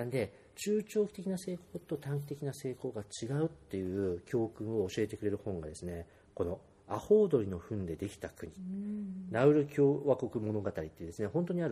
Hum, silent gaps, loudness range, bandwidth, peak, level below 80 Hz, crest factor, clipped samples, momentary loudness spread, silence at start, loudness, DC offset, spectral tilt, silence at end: none; none; 5 LU; 14.5 kHz; -14 dBFS; -62 dBFS; 20 dB; under 0.1%; 14 LU; 0 s; -35 LUFS; under 0.1%; -7 dB/octave; 0 s